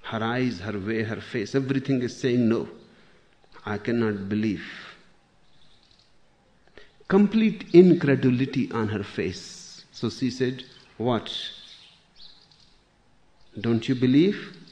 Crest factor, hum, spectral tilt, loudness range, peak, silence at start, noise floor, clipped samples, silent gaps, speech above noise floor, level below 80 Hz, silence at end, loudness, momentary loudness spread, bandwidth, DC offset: 24 dB; none; -7 dB/octave; 10 LU; -2 dBFS; 0.05 s; -62 dBFS; under 0.1%; none; 38 dB; -62 dBFS; 0.15 s; -24 LUFS; 20 LU; 9.4 kHz; under 0.1%